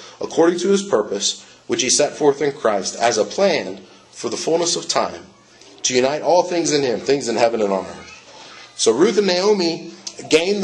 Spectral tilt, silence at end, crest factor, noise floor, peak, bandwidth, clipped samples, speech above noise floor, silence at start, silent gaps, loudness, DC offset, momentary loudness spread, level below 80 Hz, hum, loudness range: -3 dB/octave; 0 s; 18 dB; -41 dBFS; -2 dBFS; 11 kHz; under 0.1%; 22 dB; 0 s; none; -18 LUFS; under 0.1%; 16 LU; -64 dBFS; none; 2 LU